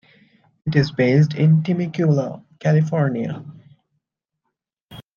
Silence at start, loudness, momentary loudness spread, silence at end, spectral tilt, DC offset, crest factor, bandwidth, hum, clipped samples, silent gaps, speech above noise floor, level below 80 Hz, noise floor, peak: 0.65 s; -19 LUFS; 13 LU; 0.15 s; -8.5 dB/octave; under 0.1%; 18 dB; 6.8 kHz; none; under 0.1%; 4.81-4.88 s; 61 dB; -58 dBFS; -79 dBFS; -4 dBFS